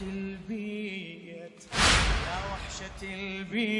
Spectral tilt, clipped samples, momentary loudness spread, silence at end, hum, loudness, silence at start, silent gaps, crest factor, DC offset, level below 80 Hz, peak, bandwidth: -3 dB/octave; under 0.1%; 19 LU; 0 s; none; -30 LUFS; 0 s; none; 22 dB; under 0.1%; -38 dBFS; -8 dBFS; 11.5 kHz